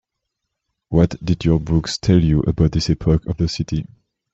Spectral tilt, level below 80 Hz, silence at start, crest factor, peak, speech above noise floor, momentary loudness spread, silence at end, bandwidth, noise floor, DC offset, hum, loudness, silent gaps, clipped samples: -7 dB/octave; -32 dBFS; 0.9 s; 16 dB; -2 dBFS; 61 dB; 8 LU; 0.5 s; 8 kHz; -78 dBFS; under 0.1%; none; -19 LUFS; none; under 0.1%